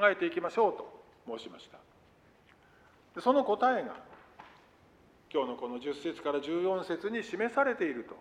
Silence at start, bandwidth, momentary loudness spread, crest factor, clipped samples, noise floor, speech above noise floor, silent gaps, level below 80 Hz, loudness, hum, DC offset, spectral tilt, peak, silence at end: 0 s; 11 kHz; 20 LU; 22 dB; under 0.1%; -63 dBFS; 31 dB; none; -74 dBFS; -32 LUFS; none; under 0.1%; -5.5 dB/octave; -12 dBFS; 0 s